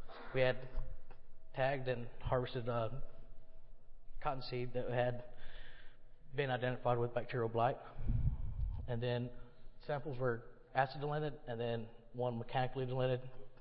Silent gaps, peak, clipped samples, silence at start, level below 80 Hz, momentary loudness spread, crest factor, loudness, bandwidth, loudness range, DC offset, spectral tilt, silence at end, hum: none; -18 dBFS; under 0.1%; 0 s; -48 dBFS; 15 LU; 20 dB; -40 LUFS; 5.4 kHz; 3 LU; under 0.1%; -5.5 dB/octave; 0 s; none